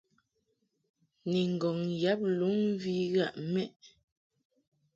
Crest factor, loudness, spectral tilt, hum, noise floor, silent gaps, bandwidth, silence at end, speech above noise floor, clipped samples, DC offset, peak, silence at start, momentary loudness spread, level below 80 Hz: 16 dB; -32 LUFS; -7 dB/octave; none; -78 dBFS; 3.76-3.80 s; 7.6 kHz; 1.1 s; 48 dB; under 0.1%; under 0.1%; -16 dBFS; 1.25 s; 5 LU; -76 dBFS